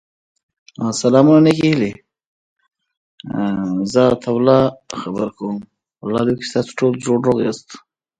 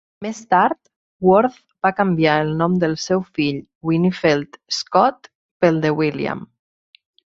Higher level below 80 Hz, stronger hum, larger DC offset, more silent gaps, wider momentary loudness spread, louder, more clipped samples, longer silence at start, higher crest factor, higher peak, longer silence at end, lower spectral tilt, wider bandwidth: about the same, -54 dBFS vs -56 dBFS; neither; neither; about the same, 2.26-2.56 s, 2.97-3.18 s vs 0.96-1.20 s, 3.75-3.81 s, 5.35-5.60 s; first, 15 LU vs 9 LU; about the same, -17 LUFS vs -19 LUFS; neither; first, 0.8 s vs 0.2 s; about the same, 18 dB vs 18 dB; about the same, 0 dBFS vs 0 dBFS; second, 0.4 s vs 0.95 s; about the same, -6.5 dB/octave vs -6 dB/octave; first, 10.5 kHz vs 7.8 kHz